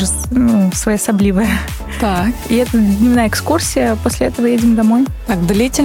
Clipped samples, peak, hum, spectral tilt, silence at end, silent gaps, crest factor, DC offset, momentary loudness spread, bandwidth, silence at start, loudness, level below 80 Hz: under 0.1%; -2 dBFS; none; -5 dB/octave; 0 s; none; 12 dB; under 0.1%; 5 LU; 17 kHz; 0 s; -14 LUFS; -26 dBFS